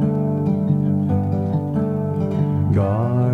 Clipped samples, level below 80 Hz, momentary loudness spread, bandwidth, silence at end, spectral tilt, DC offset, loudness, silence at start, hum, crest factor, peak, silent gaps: under 0.1%; -48 dBFS; 3 LU; 4 kHz; 0 s; -11 dB/octave; under 0.1%; -20 LUFS; 0 s; none; 12 dB; -8 dBFS; none